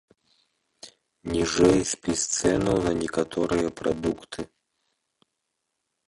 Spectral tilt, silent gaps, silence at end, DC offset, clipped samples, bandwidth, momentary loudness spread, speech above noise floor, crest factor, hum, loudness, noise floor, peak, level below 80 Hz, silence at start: -4.5 dB/octave; none; 1.65 s; under 0.1%; under 0.1%; 11.5 kHz; 16 LU; 56 dB; 20 dB; none; -25 LUFS; -80 dBFS; -8 dBFS; -48 dBFS; 0.85 s